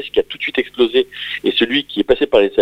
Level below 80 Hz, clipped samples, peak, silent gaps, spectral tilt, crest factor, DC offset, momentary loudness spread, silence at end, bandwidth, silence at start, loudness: -46 dBFS; under 0.1%; 0 dBFS; none; -5 dB/octave; 16 dB; under 0.1%; 6 LU; 0 s; 8.8 kHz; 0 s; -17 LUFS